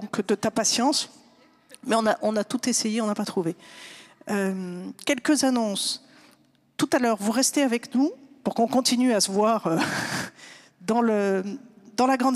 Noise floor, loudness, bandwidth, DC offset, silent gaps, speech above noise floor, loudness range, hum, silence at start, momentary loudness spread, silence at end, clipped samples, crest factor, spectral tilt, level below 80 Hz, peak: -60 dBFS; -24 LUFS; 15.5 kHz; under 0.1%; none; 36 dB; 4 LU; none; 0 s; 15 LU; 0 s; under 0.1%; 18 dB; -3.5 dB/octave; -72 dBFS; -8 dBFS